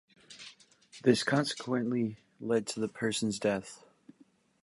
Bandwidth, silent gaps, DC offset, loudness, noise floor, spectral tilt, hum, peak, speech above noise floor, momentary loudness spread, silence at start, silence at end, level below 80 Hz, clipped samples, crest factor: 11.5 kHz; none; under 0.1%; -32 LUFS; -65 dBFS; -4.5 dB/octave; none; -12 dBFS; 34 dB; 21 LU; 0.3 s; 0.85 s; -72 dBFS; under 0.1%; 22 dB